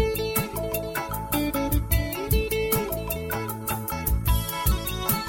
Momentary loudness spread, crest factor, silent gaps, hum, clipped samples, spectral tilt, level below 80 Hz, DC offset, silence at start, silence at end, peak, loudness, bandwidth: 5 LU; 18 dB; none; none; under 0.1%; -4.5 dB/octave; -30 dBFS; under 0.1%; 0 s; 0 s; -8 dBFS; -26 LUFS; 17 kHz